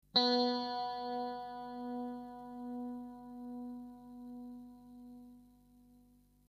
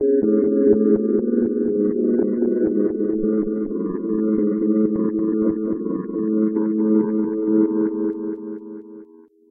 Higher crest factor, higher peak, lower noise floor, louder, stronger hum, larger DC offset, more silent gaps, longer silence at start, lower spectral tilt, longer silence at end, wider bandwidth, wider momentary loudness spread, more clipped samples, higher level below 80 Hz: first, 24 dB vs 16 dB; second, -18 dBFS vs -4 dBFS; first, -66 dBFS vs -47 dBFS; second, -39 LUFS vs -20 LUFS; first, 50 Hz at -70 dBFS vs none; neither; neither; first, 0.15 s vs 0 s; second, -4.5 dB/octave vs -15 dB/octave; about the same, 0.45 s vs 0.45 s; first, 7.2 kHz vs 2.2 kHz; first, 23 LU vs 8 LU; neither; second, -72 dBFS vs -54 dBFS